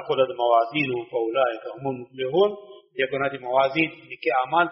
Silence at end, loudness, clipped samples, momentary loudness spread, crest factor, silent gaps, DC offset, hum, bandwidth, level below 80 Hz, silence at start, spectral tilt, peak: 0 s; -24 LUFS; under 0.1%; 10 LU; 16 dB; none; under 0.1%; none; 5.8 kHz; -68 dBFS; 0 s; -3 dB/octave; -6 dBFS